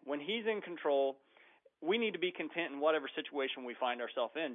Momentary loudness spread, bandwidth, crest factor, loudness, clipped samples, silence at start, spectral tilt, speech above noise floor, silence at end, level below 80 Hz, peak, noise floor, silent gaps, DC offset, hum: 5 LU; 3.9 kHz; 18 dB; -36 LUFS; under 0.1%; 0.05 s; -1 dB/octave; 29 dB; 0 s; under -90 dBFS; -20 dBFS; -66 dBFS; none; under 0.1%; none